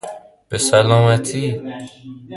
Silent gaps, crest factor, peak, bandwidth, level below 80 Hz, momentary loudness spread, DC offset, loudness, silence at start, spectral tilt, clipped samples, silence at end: none; 18 dB; 0 dBFS; 11.5 kHz; -50 dBFS; 21 LU; under 0.1%; -16 LUFS; 0.05 s; -5 dB/octave; under 0.1%; 0 s